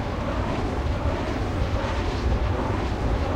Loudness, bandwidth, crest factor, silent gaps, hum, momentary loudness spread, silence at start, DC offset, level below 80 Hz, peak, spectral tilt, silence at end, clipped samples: -26 LUFS; 9.8 kHz; 12 dB; none; none; 2 LU; 0 s; under 0.1%; -28 dBFS; -12 dBFS; -7 dB/octave; 0 s; under 0.1%